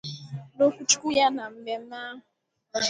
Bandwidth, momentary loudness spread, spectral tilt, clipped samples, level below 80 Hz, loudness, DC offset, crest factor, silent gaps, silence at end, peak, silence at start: 10.5 kHz; 18 LU; -2.5 dB/octave; under 0.1%; -68 dBFS; -25 LUFS; under 0.1%; 22 dB; none; 0 s; -6 dBFS; 0.05 s